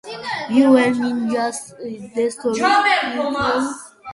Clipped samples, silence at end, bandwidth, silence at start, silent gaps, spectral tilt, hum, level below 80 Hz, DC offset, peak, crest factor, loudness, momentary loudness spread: under 0.1%; 0 s; 11.5 kHz; 0.05 s; none; -4 dB/octave; none; -56 dBFS; under 0.1%; -2 dBFS; 16 dB; -18 LUFS; 14 LU